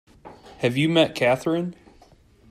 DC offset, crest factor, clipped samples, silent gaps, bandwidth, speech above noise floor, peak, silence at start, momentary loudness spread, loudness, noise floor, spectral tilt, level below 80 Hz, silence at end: under 0.1%; 18 dB; under 0.1%; none; 15 kHz; 33 dB; -6 dBFS; 0.25 s; 8 LU; -22 LUFS; -54 dBFS; -6 dB/octave; -58 dBFS; 0.8 s